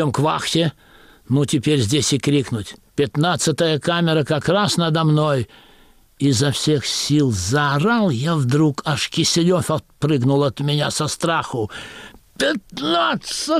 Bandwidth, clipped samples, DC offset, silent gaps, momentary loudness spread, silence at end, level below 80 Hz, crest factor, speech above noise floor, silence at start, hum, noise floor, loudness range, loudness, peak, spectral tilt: 15 kHz; under 0.1%; under 0.1%; none; 7 LU; 0 s; -50 dBFS; 12 dB; 32 dB; 0 s; none; -51 dBFS; 2 LU; -19 LUFS; -8 dBFS; -5 dB/octave